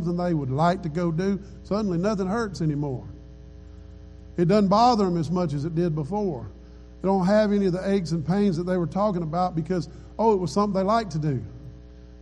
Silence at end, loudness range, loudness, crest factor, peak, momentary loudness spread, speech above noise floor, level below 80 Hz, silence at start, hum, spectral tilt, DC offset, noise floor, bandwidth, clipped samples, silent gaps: 0 s; 3 LU; -24 LUFS; 16 dB; -8 dBFS; 12 LU; 21 dB; -46 dBFS; 0 s; none; -7.5 dB/octave; under 0.1%; -44 dBFS; 10 kHz; under 0.1%; none